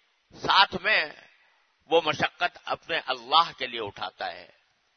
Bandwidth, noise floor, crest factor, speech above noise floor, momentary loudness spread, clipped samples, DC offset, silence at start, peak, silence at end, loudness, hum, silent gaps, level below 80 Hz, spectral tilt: 6.6 kHz; -65 dBFS; 24 dB; 38 dB; 14 LU; under 0.1%; under 0.1%; 0.35 s; -4 dBFS; 0.55 s; -26 LUFS; none; none; -66 dBFS; -3 dB/octave